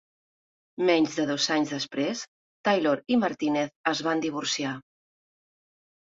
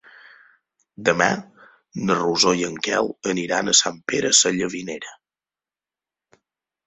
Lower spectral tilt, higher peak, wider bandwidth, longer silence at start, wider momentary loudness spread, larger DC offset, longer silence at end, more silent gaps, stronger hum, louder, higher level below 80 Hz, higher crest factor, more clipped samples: first, -3.5 dB/octave vs -2 dB/octave; second, -10 dBFS vs -2 dBFS; about the same, 7.8 kHz vs 8.4 kHz; second, 0.8 s vs 1 s; second, 9 LU vs 15 LU; neither; second, 1.25 s vs 1.75 s; first, 2.28-2.64 s, 3.76-3.84 s vs none; neither; second, -27 LUFS vs -20 LUFS; second, -72 dBFS vs -62 dBFS; about the same, 20 dB vs 22 dB; neither